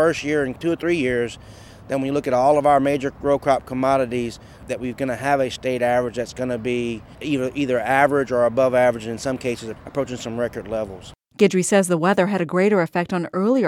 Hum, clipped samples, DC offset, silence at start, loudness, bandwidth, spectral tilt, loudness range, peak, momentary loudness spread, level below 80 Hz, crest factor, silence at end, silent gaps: none; under 0.1%; under 0.1%; 0 s; -21 LUFS; 16 kHz; -5.5 dB/octave; 3 LU; -2 dBFS; 11 LU; -50 dBFS; 18 dB; 0 s; none